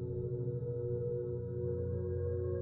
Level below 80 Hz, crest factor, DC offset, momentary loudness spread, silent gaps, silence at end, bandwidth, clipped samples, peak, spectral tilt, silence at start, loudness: -56 dBFS; 10 dB; under 0.1%; 2 LU; none; 0 s; 1.8 kHz; under 0.1%; -26 dBFS; -14 dB/octave; 0 s; -38 LUFS